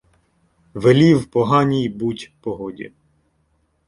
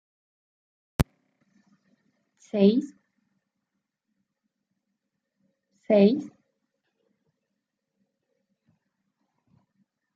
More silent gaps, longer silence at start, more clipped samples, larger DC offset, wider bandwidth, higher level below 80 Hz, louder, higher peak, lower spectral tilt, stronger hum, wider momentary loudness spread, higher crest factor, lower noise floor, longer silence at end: neither; second, 0.75 s vs 1 s; neither; neither; first, 11.5 kHz vs 9 kHz; about the same, -52 dBFS vs -50 dBFS; first, -18 LUFS vs -24 LUFS; first, -2 dBFS vs -6 dBFS; about the same, -7.5 dB/octave vs -7.5 dB/octave; neither; first, 21 LU vs 18 LU; second, 18 dB vs 26 dB; second, -65 dBFS vs -83 dBFS; second, 1 s vs 3.9 s